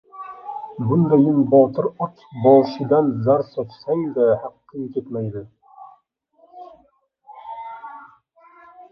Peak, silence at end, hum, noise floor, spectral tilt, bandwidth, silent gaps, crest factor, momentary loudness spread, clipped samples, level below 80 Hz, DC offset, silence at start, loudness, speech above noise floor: -2 dBFS; 0.1 s; none; -60 dBFS; -11 dB/octave; 5.8 kHz; none; 18 dB; 20 LU; under 0.1%; -62 dBFS; under 0.1%; 0.15 s; -19 LUFS; 42 dB